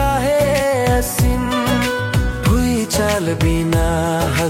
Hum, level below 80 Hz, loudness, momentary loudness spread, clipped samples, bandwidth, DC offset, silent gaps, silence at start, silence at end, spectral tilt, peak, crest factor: none; -24 dBFS; -17 LUFS; 2 LU; under 0.1%; 16.5 kHz; under 0.1%; none; 0 s; 0 s; -5 dB/octave; -4 dBFS; 12 dB